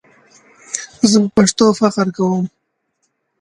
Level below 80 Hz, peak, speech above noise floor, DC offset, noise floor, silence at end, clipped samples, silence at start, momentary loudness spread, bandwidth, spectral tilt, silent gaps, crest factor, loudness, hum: -54 dBFS; 0 dBFS; 55 dB; under 0.1%; -68 dBFS; 0.95 s; under 0.1%; 0.7 s; 14 LU; 11 kHz; -5 dB/octave; none; 16 dB; -15 LUFS; none